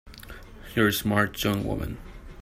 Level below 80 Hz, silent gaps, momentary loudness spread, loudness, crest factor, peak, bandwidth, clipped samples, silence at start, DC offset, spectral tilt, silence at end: -44 dBFS; none; 21 LU; -26 LUFS; 20 dB; -8 dBFS; 16 kHz; under 0.1%; 0.05 s; under 0.1%; -5 dB/octave; 0 s